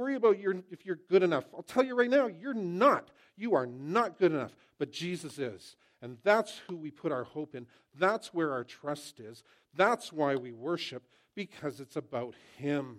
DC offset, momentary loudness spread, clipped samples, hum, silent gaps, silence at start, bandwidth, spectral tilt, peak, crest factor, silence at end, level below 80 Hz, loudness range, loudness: under 0.1%; 17 LU; under 0.1%; none; none; 0 s; 14.5 kHz; -5.5 dB/octave; -12 dBFS; 20 dB; 0 s; -82 dBFS; 5 LU; -32 LUFS